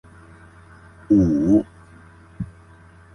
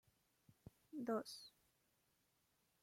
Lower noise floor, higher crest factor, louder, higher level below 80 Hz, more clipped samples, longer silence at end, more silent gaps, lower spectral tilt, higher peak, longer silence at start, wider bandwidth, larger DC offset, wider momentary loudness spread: second, -48 dBFS vs -83 dBFS; about the same, 18 dB vs 20 dB; first, -18 LUFS vs -48 LUFS; first, -42 dBFS vs -86 dBFS; neither; second, 0.65 s vs 1.35 s; neither; first, -10 dB/octave vs -4.5 dB/octave; first, -6 dBFS vs -32 dBFS; first, 1.1 s vs 0.65 s; second, 6.6 kHz vs 16.5 kHz; neither; second, 18 LU vs 22 LU